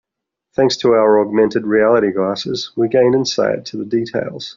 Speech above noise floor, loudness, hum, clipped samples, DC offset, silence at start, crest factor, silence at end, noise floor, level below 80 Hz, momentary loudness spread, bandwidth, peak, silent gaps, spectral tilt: 65 dB; -16 LUFS; none; under 0.1%; under 0.1%; 0.6 s; 14 dB; 0.05 s; -81 dBFS; -56 dBFS; 9 LU; 7.4 kHz; -2 dBFS; none; -4 dB/octave